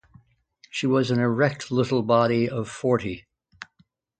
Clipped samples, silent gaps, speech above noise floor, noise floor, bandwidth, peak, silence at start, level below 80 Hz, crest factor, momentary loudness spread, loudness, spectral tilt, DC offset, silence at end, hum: under 0.1%; none; 42 dB; -64 dBFS; 9 kHz; -6 dBFS; 0.75 s; -58 dBFS; 20 dB; 23 LU; -23 LUFS; -6.5 dB/octave; under 0.1%; 0.55 s; none